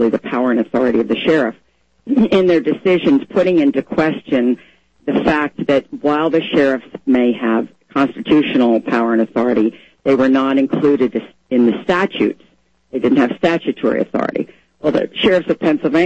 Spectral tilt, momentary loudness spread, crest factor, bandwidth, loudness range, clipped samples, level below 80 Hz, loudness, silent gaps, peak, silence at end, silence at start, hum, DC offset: -7 dB/octave; 7 LU; 14 dB; 8.2 kHz; 2 LU; under 0.1%; -50 dBFS; -16 LUFS; none; -2 dBFS; 0 s; 0 s; none; 0.1%